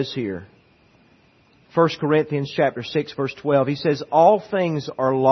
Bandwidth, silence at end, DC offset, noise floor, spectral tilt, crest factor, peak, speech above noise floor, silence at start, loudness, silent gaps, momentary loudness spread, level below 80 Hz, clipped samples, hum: 6.4 kHz; 0 s; under 0.1%; -56 dBFS; -7 dB/octave; 18 dB; -4 dBFS; 36 dB; 0 s; -21 LUFS; none; 10 LU; -64 dBFS; under 0.1%; none